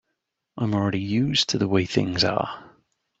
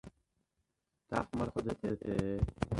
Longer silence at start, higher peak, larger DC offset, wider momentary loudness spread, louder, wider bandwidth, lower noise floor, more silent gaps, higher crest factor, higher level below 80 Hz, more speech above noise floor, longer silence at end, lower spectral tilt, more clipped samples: first, 0.55 s vs 0.05 s; first, -6 dBFS vs -14 dBFS; neither; first, 8 LU vs 3 LU; first, -23 LUFS vs -37 LUFS; second, 8 kHz vs 11.5 kHz; second, -79 dBFS vs -83 dBFS; neither; about the same, 20 dB vs 24 dB; second, -56 dBFS vs -48 dBFS; first, 56 dB vs 48 dB; first, 0.5 s vs 0 s; second, -5 dB/octave vs -7.5 dB/octave; neither